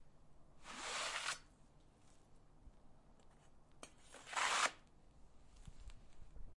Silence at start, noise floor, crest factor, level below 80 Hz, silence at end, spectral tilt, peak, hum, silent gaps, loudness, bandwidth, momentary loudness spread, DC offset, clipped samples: 0 s; -66 dBFS; 28 dB; -64 dBFS; 0 s; 0 dB/octave; -20 dBFS; none; none; -41 LUFS; 11.5 kHz; 26 LU; under 0.1%; under 0.1%